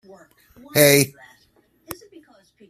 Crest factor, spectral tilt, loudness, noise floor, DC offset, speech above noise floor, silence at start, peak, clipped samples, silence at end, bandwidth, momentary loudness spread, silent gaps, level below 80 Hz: 22 dB; -3.5 dB/octave; -17 LUFS; -61 dBFS; under 0.1%; 42 dB; 0.75 s; 0 dBFS; under 0.1%; 0.75 s; 15.5 kHz; 24 LU; none; -58 dBFS